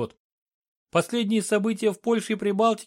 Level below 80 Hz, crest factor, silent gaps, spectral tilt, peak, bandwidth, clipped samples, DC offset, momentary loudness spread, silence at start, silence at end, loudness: -70 dBFS; 16 dB; 0.19-0.46 s, 0.54-0.86 s; -5 dB/octave; -8 dBFS; 16 kHz; under 0.1%; under 0.1%; 4 LU; 0 s; 0 s; -25 LUFS